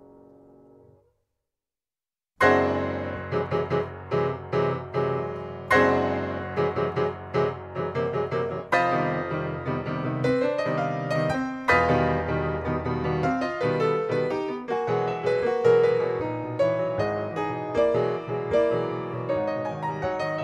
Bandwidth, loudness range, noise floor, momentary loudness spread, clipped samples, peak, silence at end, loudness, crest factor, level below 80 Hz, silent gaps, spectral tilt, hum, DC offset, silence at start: 12.5 kHz; 2 LU; under -90 dBFS; 9 LU; under 0.1%; -6 dBFS; 0 s; -26 LUFS; 18 dB; -52 dBFS; none; -7 dB/octave; none; under 0.1%; 2.4 s